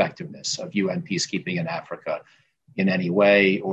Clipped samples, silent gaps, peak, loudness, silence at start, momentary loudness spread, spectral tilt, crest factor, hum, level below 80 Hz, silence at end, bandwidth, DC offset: under 0.1%; none; -6 dBFS; -23 LUFS; 0 s; 14 LU; -4.5 dB/octave; 18 dB; none; -64 dBFS; 0 s; 8.6 kHz; under 0.1%